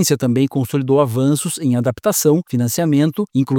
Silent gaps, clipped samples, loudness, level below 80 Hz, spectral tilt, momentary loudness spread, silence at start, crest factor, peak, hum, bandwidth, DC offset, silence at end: none; under 0.1%; -17 LUFS; -56 dBFS; -5.5 dB/octave; 3 LU; 0 s; 14 dB; -2 dBFS; none; 19 kHz; under 0.1%; 0 s